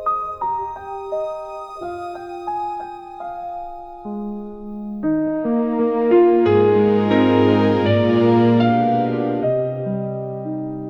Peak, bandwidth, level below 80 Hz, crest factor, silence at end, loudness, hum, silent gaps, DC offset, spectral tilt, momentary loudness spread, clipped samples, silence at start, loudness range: -4 dBFS; 6.4 kHz; -52 dBFS; 16 dB; 0 s; -18 LUFS; none; none; under 0.1%; -9 dB/octave; 16 LU; under 0.1%; 0 s; 14 LU